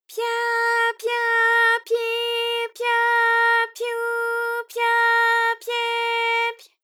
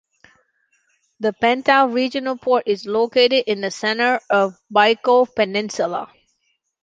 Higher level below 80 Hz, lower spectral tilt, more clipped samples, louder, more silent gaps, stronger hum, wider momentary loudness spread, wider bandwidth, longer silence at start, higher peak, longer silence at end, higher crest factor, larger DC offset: second, under -90 dBFS vs -66 dBFS; second, 4 dB/octave vs -3.5 dB/octave; neither; about the same, -20 LUFS vs -18 LUFS; neither; neither; about the same, 8 LU vs 8 LU; first, 18 kHz vs 7.8 kHz; second, 0.1 s vs 1.2 s; second, -10 dBFS vs -2 dBFS; second, 0.3 s vs 0.8 s; second, 12 dB vs 18 dB; neither